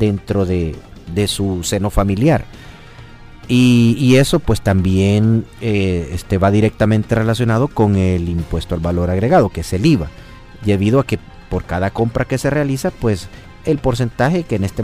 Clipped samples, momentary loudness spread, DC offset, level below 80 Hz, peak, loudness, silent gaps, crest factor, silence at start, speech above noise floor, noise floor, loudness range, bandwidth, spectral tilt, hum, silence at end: under 0.1%; 10 LU; under 0.1%; -32 dBFS; -2 dBFS; -16 LUFS; none; 14 dB; 0 s; 22 dB; -37 dBFS; 4 LU; 15.5 kHz; -6.5 dB/octave; none; 0 s